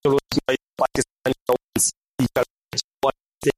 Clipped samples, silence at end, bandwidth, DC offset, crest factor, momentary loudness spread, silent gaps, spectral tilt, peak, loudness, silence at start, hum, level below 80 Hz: under 0.1%; 0.05 s; 15.5 kHz; under 0.1%; 20 dB; 5 LU; 1.12-1.16 s, 1.42-1.46 s, 1.64-1.68 s, 1.97-2.01 s, 2.09-2.14 s, 2.50-2.56 s, 2.84-2.91 s, 3.28-3.32 s; -3.5 dB/octave; -4 dBFS; -23 LUFS; 0.05 s; none; -50 dBFS